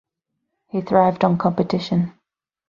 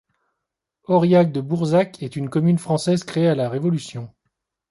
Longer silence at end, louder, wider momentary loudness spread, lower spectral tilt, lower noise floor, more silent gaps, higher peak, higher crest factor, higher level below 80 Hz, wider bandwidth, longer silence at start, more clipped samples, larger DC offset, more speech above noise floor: about the same, 0.6 s vs 0.65 s; about the same, -20 LUFS vs -20 LUFS; about the same, 11 LU vs 12 LU; about the same, -8.5 dB/octave vs -7.5 dB/octave; second, -78 dBFS vs -82 dBFS; neither; about the same, -2 dBFS vs -4 dBFS; about the same, 20 dB vs 16 dB; about the same, -58 dBFS vs -62 dBFS; second, 7.2 kHz vs 11.5 kHz; second, 0.75 s vs 0.9 s; neither; neither; about the same, 59 dB vs 62 dB